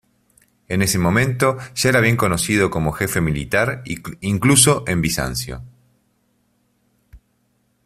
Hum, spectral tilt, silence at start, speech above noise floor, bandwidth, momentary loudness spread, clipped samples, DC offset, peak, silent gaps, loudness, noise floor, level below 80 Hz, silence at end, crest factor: none; -4 dB/octave; 0.7 s; 47 dB; 16 kHz; 12 LU; under 0.1%; under 0.1%; 0 dBFS; none; -18 LUFS; -65 dBFS; -42 dBFS; 0.7 s; 20 dB